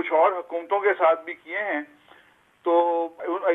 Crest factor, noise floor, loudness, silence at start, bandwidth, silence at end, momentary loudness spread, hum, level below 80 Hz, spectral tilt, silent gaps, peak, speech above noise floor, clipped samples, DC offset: 16 dB; -57 dBFS; -24 LUFS; 0 s; 3.9 kHz; 0 s; 11 LU; none; -80 dBFS; -5.5 dB/octave; none; -8 dBFS; 34 dB; under 0.1%; under 0.1%